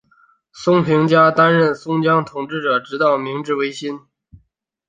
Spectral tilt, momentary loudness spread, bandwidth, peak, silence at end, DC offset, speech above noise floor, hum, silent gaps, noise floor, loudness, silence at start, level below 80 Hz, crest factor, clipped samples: -6.5 dB/octave; 12 LU; 9.4 kHz; -2 dBFS; 0.9 s; under 0.1%; 48 dB; none; none; -64 dBFS; -16 LUFS; 0.55 s; -60 dBFS; 16 dB; under 0.1%